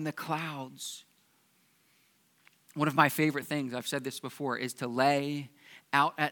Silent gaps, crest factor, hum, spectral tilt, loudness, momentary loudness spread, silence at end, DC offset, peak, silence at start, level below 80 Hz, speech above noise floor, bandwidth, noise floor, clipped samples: none; 26 dB; none; -4.5 dB/octave; -31 LUFS; 15 LU; 0 s; under 0.1%; -6 dBFS; 0 s; -84 dBFS; 38 dB; 19 kHz; -69 dBFS; under 0.1%